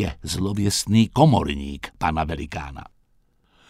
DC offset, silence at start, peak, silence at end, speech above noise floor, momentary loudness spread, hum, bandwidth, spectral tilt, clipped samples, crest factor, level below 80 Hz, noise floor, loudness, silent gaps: under 0.1%; 0 s; -2 dBFS; 0.85 s; 40 dB; 16 LU; none; 16 kHz; -5.5 dB/octave; under 0.1%; 22 dB; -38 dBFS; -62 dBFS; -22 LUFS; none